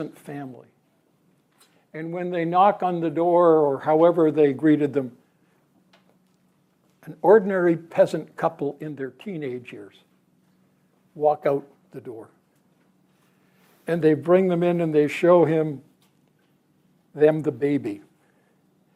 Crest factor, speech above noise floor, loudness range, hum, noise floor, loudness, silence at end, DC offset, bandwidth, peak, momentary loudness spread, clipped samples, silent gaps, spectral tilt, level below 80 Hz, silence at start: 18 dB; 44 dB; 10 LU; none; -65 dBFS; -21 LUFS; 0.95 s; under 0.1%; 12.5 kHz; -4 dBFS; 22 LU; under 0.1%; none; -8 dB/octave; -76 dBFS; 0 s